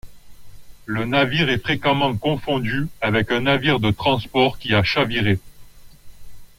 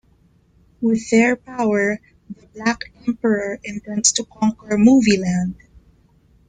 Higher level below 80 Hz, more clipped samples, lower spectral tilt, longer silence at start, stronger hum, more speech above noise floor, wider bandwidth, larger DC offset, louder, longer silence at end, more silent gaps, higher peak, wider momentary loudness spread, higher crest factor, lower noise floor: first, -44 dBFS vs -52 dBFS; neither; first, -6.5 dB/octave vs -4 dB/octave; second, 0.05 s vs 0.8 s; neither; second, 22 dB vs 38 dB; first, 16.5 kHz vs 9.6 kHz; neither; about the same, -20 LUFS vs -19 LUFS; second, 0.1 s vs 0.95 s; neither; about the same, -4 dBFS vs -2 dBFS; second, 6 LU vs 13 LU; about the same, 16 dB vs 18 dB; second, -41 dBFS vs -56 dBFS